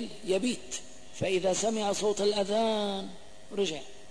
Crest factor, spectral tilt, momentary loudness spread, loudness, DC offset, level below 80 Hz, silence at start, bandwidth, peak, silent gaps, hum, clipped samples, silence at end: 14 dB; -3.5 dB/octave; 12 LU; -30 LUFS; 0.7%; -62 dBFS; 0 s; 11 kHz; -18 dBFS; none; none; under 0.1%; 0 s